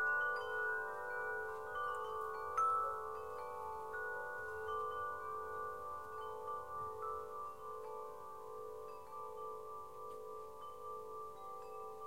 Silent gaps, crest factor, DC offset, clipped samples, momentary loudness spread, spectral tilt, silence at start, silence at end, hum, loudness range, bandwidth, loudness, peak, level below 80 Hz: none; 18 dB; 0.1%; under 0.1%; 12 LU; -3.5 dB/octave; 0 s; 0 s; none; 9 LU; 16.5 kHz; -44 LUFS; -26 dBFS; -72 dBFS